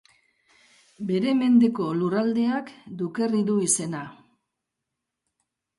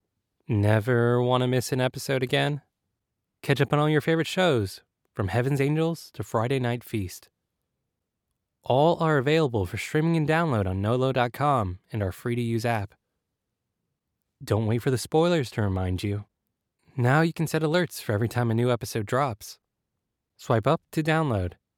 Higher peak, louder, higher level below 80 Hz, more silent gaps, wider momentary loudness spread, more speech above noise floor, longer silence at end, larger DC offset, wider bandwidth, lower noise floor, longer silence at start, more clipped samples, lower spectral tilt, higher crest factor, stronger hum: about the same, -10 dBFS vs -8 dBFS; about the same, -24 LUFS vs -25 LUFS; second, -72 dBFS vs -58 dBFS; neither; first, 15 LU vs 10 LU; about the same, 60 dB vs 58 dB; first, 1.65 s vs 0.3 s; neither; second, 11.5 kHz vs 17.5 kHz; about the same, -84 dBFS vs -82 dBFS; first, 1 s vs 0.5 s; neither; second, -5 dB/octave vs -6.5 dB/octave; about the same, 16 dB vs 18 dB; neither